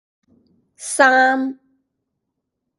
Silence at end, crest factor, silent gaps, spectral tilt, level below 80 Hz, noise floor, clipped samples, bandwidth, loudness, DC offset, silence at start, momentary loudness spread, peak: 1.25 s; 20 dB; none; -1 dB/octave; -74 dBFS; -77 dBFS; under 0.1%; 11.5 kHz; -16 LUFS; under 0.1%; 0.8 s; 16 LU; 0 dBFS